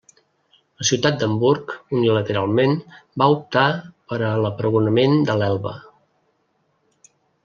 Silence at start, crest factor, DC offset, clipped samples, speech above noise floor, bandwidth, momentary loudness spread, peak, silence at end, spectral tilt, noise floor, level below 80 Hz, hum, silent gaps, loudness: 0.8 s; 18 dB; under 0.1%; under 0.1%; 48 dB; 7.4 kHz; 9 LU; -2 dBFS; 1.65 s; -5.5 dB/octave; -67 dBFS; -62 dBFS; none; none; -20 LUFS